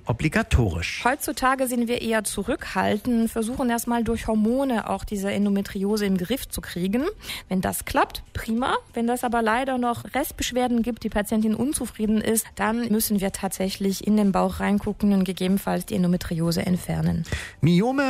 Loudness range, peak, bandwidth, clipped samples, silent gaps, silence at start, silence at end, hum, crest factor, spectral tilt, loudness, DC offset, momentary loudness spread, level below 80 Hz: 2 LU; -6 dBFS; 16 kHz; under 0.1%; none; 0.05 s; 0 s; none; 18 dB; -5.5 dB/octave; -24 LUFS; under 0.1%; 5 LU; -40 dBFS